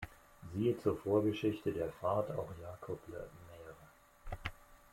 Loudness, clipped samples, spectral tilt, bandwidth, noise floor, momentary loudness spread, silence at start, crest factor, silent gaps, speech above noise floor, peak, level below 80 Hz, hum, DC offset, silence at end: -38 LUFS; under 0.1%; -7.5 dB/octave; 16.5 kHz; -62 dBFS; 20 LU; 0 s; 18 dB; none; 26 dB; -20 dBFS; -58 dBFS; none; under 0.1%; 0.15 s